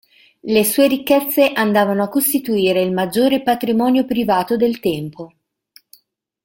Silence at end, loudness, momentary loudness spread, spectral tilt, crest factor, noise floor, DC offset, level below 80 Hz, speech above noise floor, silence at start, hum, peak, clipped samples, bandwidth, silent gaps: 1.2 s; -16 LUFS; 8 LU; -4.5 dB/octave; 16 dB; -59 dBFS; under 0.1%; -56 dBFS; 43 dB; 0.45 s; none; -2 dBFS; under 0.1%; 17 kHz; none